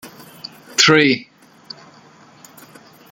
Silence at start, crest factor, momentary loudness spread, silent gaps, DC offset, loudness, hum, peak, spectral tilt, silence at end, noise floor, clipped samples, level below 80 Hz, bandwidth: 0.05 s; 20 dB; 26 LU; none; under 0.1%; -14 LUFS; none; 0 dBFS; -3 dB/octave; 1.9 s; -47 dBFS; under 0.1%; -64 dBFS; 17 kHz